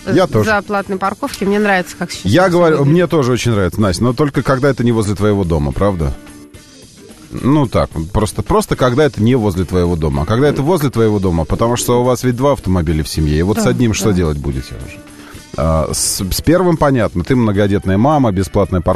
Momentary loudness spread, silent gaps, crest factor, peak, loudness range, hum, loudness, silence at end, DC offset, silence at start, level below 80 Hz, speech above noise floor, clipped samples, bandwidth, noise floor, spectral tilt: 7 LU; none; 12 dB; -2 dBFS; 3 LU; none; -14 LUFS; 0 s; 0.9%; 0 s; -28 dBFS; 25 dB; under 0.1%; 13.5 kHz; -39 dBFS; -6 dB/octave